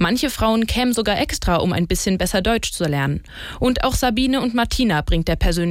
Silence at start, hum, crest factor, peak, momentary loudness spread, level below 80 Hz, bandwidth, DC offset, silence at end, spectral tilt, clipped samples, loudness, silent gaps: 0 s; none; 12 dB; -6 dBFS; 3 LU; -28 dBFS; 16.5 kHz; under 0.1%; 0 s; -4.5 dB/octave; under 0.1%; -19 LUFS; none